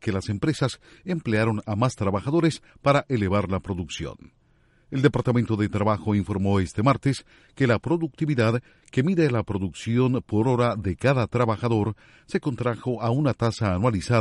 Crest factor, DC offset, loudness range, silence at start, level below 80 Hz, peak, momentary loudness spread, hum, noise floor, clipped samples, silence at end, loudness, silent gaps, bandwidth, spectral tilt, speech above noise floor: 20 dB; under 0.1%; 2 LU; 0.05 s; -50 dBFS; -4 dBFS; 8 LU; none; -61 dBFS; under 0.1%; 0 s; -24 LUFS; none; 11.5 kHz; -7 dB/octave; 37 dB